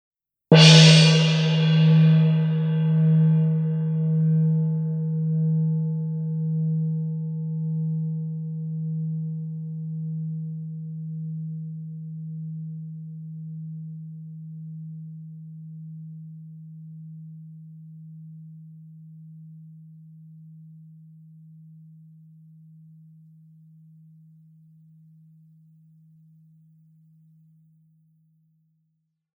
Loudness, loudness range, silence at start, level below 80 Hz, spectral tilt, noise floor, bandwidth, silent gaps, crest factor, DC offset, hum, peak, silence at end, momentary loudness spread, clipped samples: -21 LUFS; 25 LU; 0.5 s; -74 dBFS; -5.5 dB/octave; -75 dBFS; 9 kHz; none; 24 dB; under 0.1%; none; -2 dBFS; 8.55 s; 25 LU; under 0.1%